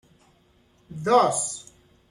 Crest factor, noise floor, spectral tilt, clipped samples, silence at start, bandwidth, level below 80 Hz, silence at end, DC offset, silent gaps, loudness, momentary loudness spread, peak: 20 dB; -61 dBFS; -3.5 dB/octave; under 0.1%; 0.9 s; 12.5 kHz; -66 dBFS; 0.5 s; under 0.1%; none; -22 LUFS; 19 LU; -6 dBFS